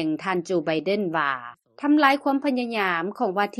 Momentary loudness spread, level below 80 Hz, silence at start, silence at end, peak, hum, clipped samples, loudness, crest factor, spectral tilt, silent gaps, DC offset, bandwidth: 8 LU; -72 dBFS; 0 s; 0.05 s; -4 dBFS; none; under 0.1%; -23 LUFS; 20 dB; -5.5 dB/octave; none; under 0.1%; 13.5 kHz